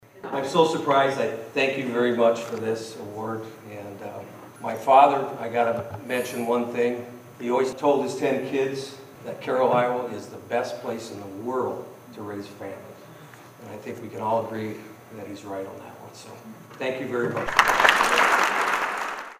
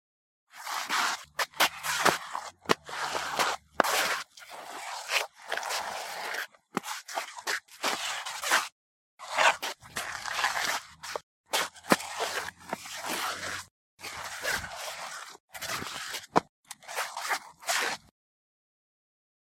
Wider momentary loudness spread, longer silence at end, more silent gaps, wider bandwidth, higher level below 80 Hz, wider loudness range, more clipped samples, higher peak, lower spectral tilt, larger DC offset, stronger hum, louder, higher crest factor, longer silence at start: first, 22 LU vs 14 LU; second, 0 s vs 1.45 s; second, none vs 8.72-9.18 s, 11.23-11.44 s, 13.71-13.98 s, 15.40-15.48 s, 16.49-16.63 s; about the same, 15.5 kHz vs 16.5 kHz; first, -62 dBFS vs -68 dBFS; first, 11 LU vs 6 LU; neither; about the same, 0 dBFS vs -2 dBFS; first, -4 dB/octave vs -1 dB/octave; neither; neither; first, -24 LUFS vs -31 LUFS; second, 26 dB vs 32 dB; second, 0.15 s vs 0.55 s